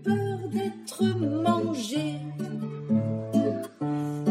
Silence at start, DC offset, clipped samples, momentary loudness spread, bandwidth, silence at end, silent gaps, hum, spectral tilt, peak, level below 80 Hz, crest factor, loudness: 0 s; under 0.1%; under 0.1%; 8 LU; 15 kHz; 0 s; none; none; -6.5 dB/octave; -12 dBFS; -70 dBFS; 16 dB; -28 LUFS